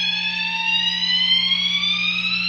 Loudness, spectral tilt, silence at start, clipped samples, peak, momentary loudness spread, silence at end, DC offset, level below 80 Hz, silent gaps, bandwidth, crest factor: -17 LUFS; -1 dB/octave; 0 s; under 0.1%; -8 dBFS; 5 LU; 0 s; under 0.1%; -58 dBFS; none; 10 kHz; 14 dB